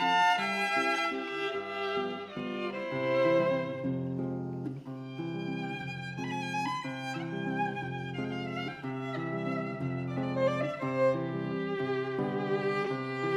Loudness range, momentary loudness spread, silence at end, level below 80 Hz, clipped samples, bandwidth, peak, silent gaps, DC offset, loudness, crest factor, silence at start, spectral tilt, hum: 5 LU; 9 LU; 0 s; -72 dBFS; under 0.1%; 14 kHz; -14 dBFS; none; under 0.1%; -32 LUFS; 18 dB; 0 s; -6 dB/octave; none